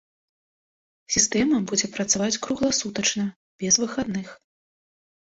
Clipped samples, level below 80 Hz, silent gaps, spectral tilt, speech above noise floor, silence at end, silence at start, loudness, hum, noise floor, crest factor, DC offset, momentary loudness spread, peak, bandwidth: under 0.1%; -56 dBFS; 3.36-3.59 s; -2.5 dB/octave; over 66 dB; 0.9 s; 1.1 s; -23 LUFS; none; under -90 dBFS; 22 dB; under 0.1%; 11 LU; -4 dBFS; 8.2 kHz